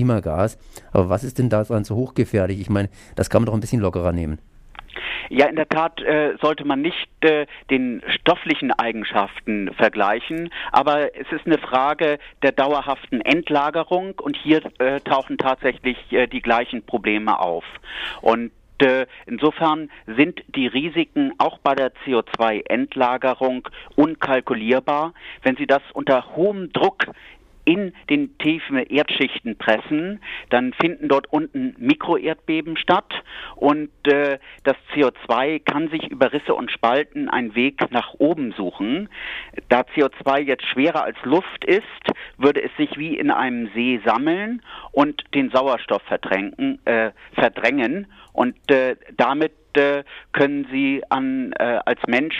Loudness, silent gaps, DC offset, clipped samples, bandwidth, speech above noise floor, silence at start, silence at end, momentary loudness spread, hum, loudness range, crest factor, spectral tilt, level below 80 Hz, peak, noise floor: -21 LUFS; none; under 0.1%; under 0.1%; 13 kHz; 19 dB; 0 s; 0 s; 7 LU; none; 1 LU; 18 dB; -6.5 dB/octave; -48 dBFS; -2 dBFS; -39 dBFS